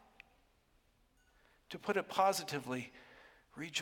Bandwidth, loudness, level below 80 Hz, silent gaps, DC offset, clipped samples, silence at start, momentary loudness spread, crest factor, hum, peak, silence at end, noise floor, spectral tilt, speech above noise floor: 17 kHz; -37 LUFS; -76 dBFS; none; under 0.1%; under 0.1%; 1.7 s; 20 LU; 24 dB; none; -18 dBFS; 0 s; -73 dBFS; -3 dB/octave; 35 dB